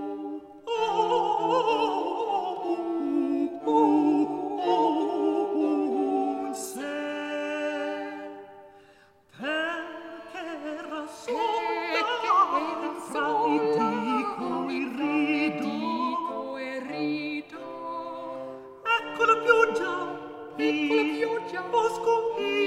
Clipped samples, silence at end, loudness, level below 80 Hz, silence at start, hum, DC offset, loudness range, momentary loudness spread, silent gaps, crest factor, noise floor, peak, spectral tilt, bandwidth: under 0.1%; 0 s; -27 LUFS; -74 dBFS; 0 s; none; under 0.1%; 8 LU; 13 LU; none; 20 dB; -57 dBFS; -6 dBFS; -4.5 dB/octave; 14 kHz